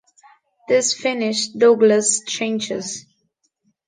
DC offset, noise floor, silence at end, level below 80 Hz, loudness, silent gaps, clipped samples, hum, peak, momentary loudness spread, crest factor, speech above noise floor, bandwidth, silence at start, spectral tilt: under 0.1%; -69 dBFS; 0.85 s; -70 dBFS; -18 LUFS; none; under 0.1%; none; -4 dBFS; 12 LU; 18 dB; 51 dB; 10 kHz; 0.7 s; -2.5 dB/octave